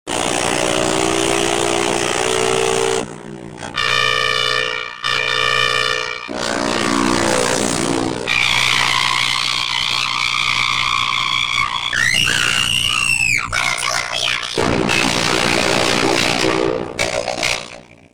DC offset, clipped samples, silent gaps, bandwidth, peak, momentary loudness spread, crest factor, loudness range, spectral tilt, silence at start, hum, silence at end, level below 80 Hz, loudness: 1%; under 0.1%; none; 19.5 kHz; -4 dBFS; 6 LU; 14 dB; 2 LU; -2 dB/octave; 0.05 s; none; 0 s; -44 dBFS; -16 LUFS